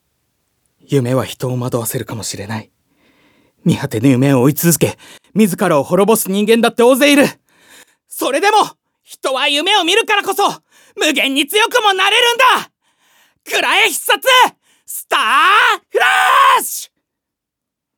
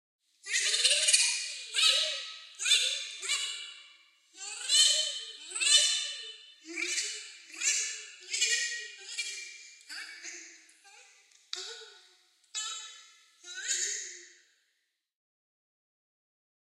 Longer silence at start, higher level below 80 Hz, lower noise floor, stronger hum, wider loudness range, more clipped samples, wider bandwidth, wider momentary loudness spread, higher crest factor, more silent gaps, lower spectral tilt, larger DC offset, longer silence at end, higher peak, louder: first, 0.9 s vs 0.45 s; first, -62 dBFS vs -88 dBFS; about the same, -80 dBFS vs -80 dBFS; neither; second, 5 LU vs 15 LU; neither; first, over 20 kHz vs 16 kHz; second, 12 LU vs 21 LU; second, 14 dB vs 26 dB; neither; first, -3.5 dB/octave vs 6 dB/octave; neither; second, 1.1 s vs 2.4 s; first, 0 dBFS vs -8 dBFS; first, -13 LUFS vs -28 LUFS